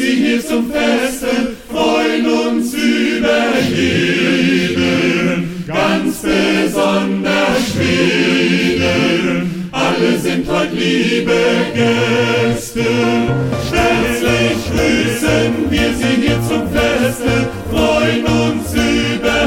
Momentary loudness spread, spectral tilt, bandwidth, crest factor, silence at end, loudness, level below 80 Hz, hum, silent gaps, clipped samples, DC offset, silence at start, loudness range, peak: 4 LU; -5 dB/octave; 16.5 kHz; 14 dB; 0 s; -14 LUFS; -34 dBFS; none; none; under 0.1%; under 0.1%; 0 s; 1 LU; -2 dBFS